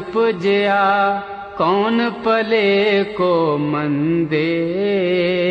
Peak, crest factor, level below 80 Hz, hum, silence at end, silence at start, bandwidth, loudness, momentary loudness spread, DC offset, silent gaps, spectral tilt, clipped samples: -6 dBFS; 12 dB; -56 dBFS; none; 0 s; 0 s; 7.6 kHz; -17 LUFS; 5 LU; under 0.1%; none; -7.5 dB/octave; under 0.1%